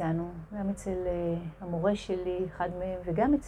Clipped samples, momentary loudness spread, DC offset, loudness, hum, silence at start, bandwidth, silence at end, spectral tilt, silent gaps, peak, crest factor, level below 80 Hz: under 0.1%; 6 LU; under 0.1%; -32 LUFS; none; 0 s; 12 kHz; 0 s; -7.5 dB/octave; none; -16 dBFS; 16 dB; -48 dBFS